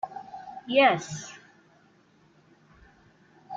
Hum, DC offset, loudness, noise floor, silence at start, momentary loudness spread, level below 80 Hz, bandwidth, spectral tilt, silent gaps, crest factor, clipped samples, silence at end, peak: none; under 0.1%; -25 LUFS; -61 dBFS; 0.05 s; 23 LU; -68 dBFS; 7.8 kHz; -4 dB/octave; none; 22 dB; under 0.1%; 0 s; -8 dBFS